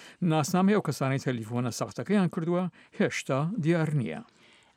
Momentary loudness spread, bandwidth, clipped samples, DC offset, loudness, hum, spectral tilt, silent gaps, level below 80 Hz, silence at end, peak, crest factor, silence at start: 8 LU; 16 kHz; under 0.1%; under 0.1%; -28 LUFS; none; -6.5 dB/octave; none; -74 dBFS; 0.55 s; -14 dBFS; 16 dB; 0 s